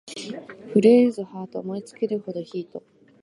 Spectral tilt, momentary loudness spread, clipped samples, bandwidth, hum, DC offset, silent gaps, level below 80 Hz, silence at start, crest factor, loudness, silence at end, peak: -6.5 dB/octave; 20 LU; under 0.1%; 11 kHz; none; under 0.1%; none; -76 dBFS; 0.05 s; 20 dB; -22 LUFS; 0.45 s; -4 dBFS